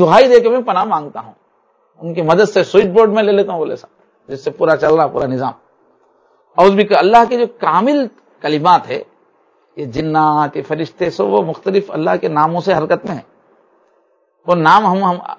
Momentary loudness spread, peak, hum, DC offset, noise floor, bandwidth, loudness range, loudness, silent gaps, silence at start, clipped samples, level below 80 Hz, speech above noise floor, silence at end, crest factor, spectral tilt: 15 LU; 0 dBFS; none; under 0.1%; -58 dBFS; 8 kHz; 4 LU; -14 LUFS; none; 0 s; 0.4%; -54 dBFS; 45 dB; 0.05 s; 14 dB; -6.5 dB/octave